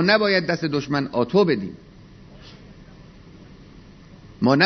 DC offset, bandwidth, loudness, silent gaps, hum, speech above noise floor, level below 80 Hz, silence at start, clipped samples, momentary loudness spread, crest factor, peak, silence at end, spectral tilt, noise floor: under 0.1%; 6.4 kHz; -21 LUFS; none; none; 25 dB; -52 dBFS; 0 s; under 0.1%; 26 LU; 20 dB; -2 dBFS; 0 s; -6.5 dB/octave; -45 dBFS